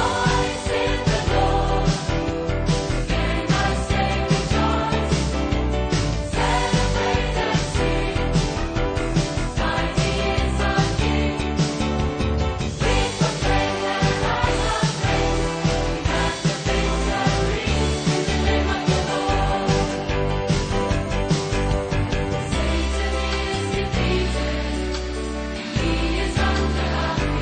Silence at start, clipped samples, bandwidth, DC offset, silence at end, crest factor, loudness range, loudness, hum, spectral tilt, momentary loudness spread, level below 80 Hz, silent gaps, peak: 0 s; under 0.1%; 9.4 kHz; under 0.1%; 0 s; 14 dB; 2 LU; -22 LUFS; none; -5 dB/octave; 3 LU; -26 dBFS; none; -6 dBFS